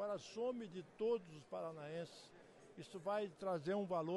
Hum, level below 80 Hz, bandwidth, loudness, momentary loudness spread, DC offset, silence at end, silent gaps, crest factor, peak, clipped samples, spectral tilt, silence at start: none; -84 dBFS; 11.5 kHz; -45 LUFS; 17 LU; under 0.1%; 0 s; none; 14 dB; -30 dBFS; under 0.1%; -6 dB/octave; 0 s